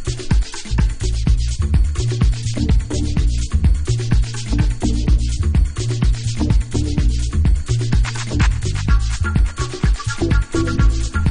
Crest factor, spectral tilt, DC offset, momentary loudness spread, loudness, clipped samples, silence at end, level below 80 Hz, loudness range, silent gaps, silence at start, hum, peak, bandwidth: 12 dB; -6 dB/octave; under 0.1%; 3 LU; -19 LUFS; under 0.1%; 0 s; -18 dBFS; 0 LU; none; 0 s; none; -4 dBFS; 10 kHz